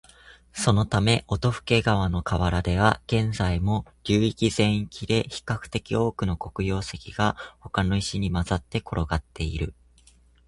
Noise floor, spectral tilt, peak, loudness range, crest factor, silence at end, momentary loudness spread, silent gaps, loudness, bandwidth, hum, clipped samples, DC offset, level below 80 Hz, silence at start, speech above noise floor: -57 dBFS; -5.5 dB/octave; -4 dBFS; 4 LU; 22 dB; 0.75 s; 8 LU; none; -25 LUFS; 11.5 kHz; none; under 0.1%; under 0.1%; -38 dBFS; 0.55 s; 32 dB